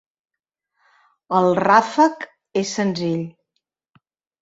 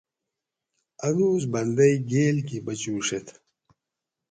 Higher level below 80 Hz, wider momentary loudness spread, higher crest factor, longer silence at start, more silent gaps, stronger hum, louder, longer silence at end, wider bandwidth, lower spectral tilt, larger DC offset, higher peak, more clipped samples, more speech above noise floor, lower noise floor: about the same, -66 dBFS vs -64 dBFS; about the same, 13 LU vs 11 LU; about the same, 20 dB vs 18 dB; first, 1.3 s vs 1 s; neither; neither; first, -19 LUFS vs -24 LUFS; about the same, 1.1 s vs 1 s; second, 8 kHz vs 9.4 kHz; about the same, -5.5 dB/octave vs -5.5 dB/octave; neither; first, -2 dBFS vs -8 dBFS; neither; about the same, 62 dB vs 62 dB; second, -80 dBFS vs -86 dBFS